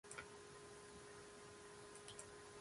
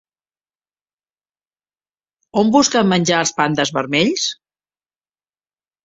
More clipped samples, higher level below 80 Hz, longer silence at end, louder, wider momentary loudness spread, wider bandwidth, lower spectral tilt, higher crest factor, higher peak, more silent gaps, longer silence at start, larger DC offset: neither; second, -76 dBFS vs -60 dBFS; second, 0 s vs 1.5 s; second, -57 LUFS vs -16 LUFS; second, 3 LU vs 9 LU; first, 11.5 kHz vs 8.2 kHz; about the same, -2.5 dB/octave vs -3.5 dB/octave; about the same, 22 dB vs 18 dB; second, -36 dBFS vs -2 dBFS; neither; second, 0.05 s vs 2.35 s; neither